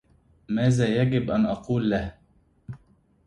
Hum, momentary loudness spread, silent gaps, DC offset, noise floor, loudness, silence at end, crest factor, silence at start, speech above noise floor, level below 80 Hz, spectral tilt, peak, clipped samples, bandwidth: none; 22 LU; none; under 0.1%; -62 dBFS; -24 LUFS; 0.5 s; 16 dB; 0.5 s; 39 dB; -48 dBFS; -7.5 dB/octave; -10 dBFS; under 0.1%; 11 kHz